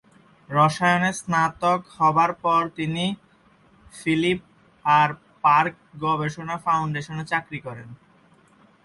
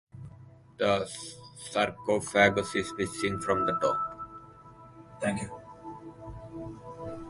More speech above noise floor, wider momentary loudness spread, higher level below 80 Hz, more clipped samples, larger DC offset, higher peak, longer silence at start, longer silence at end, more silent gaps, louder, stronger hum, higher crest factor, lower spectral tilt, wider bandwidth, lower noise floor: first, 35 dB vs 24 dB; second, 11 LU vs 21 LU; about the same, -60 dBFS vs -56 dBFS; neither; neither; about the same, -6 dBFS vs -8 dBFS; first, 0.5 s vs 0.15 s; first, 0.9 s vs 0 s; neither; first, -22 LUFS vs -29 LUFS; neither; second, 18 dB vs 24 dB; about the same, -5.5 dB/octave vs -4.5 dB/octave; about the same, 11.5 kHz vs 11.5 kHz; first, -57 dBFS vs -52 dBFS